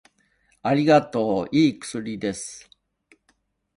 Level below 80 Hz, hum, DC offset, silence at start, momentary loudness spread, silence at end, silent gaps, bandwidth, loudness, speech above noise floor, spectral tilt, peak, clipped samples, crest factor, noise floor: -60 dBFS; none; under 0.1%; 0.65 s; 16 LU; 1.15 s; none; 11.5 kHz; -22 LUFS; 46 dB; -5.5 dB/octave; -6 dBFS; under 0.1%; 20 dB; -68 dBFS